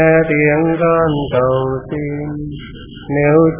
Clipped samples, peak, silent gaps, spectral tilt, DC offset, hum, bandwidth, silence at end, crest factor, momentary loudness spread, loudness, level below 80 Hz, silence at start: under 0.1%; 0 dBFS; none; -11.5 dB/octave; under 0.1%; none; 3.6 kHz; 0 s; 14 dB; 16 LU; -15 LUFS; -38 dBFS; 0 s